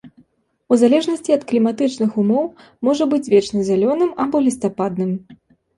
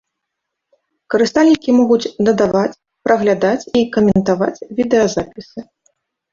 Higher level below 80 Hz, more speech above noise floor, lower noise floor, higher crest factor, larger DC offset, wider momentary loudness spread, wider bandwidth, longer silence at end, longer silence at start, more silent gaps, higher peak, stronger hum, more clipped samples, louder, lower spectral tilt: second, -60 dBFS vs -48 dBFS; second, 41 dB vs 63 dB; second, -58 dBFS vs -78 dBFS; about the same, 16 dB vs 14 dB; neither; second, 7 LU vs 11 LU; first, 11.5 kHz vs 7.6 kHz; second, 0.45 s vs 0.7 s; second, 0.05 s vs 1.1 s; neither; about the same, -2 dBFS vs -2 dBFS; neither; neither; second, -18 LUFS vs -15 LUFS; about the same, -6.5 dB/octave vs -6 dB/octave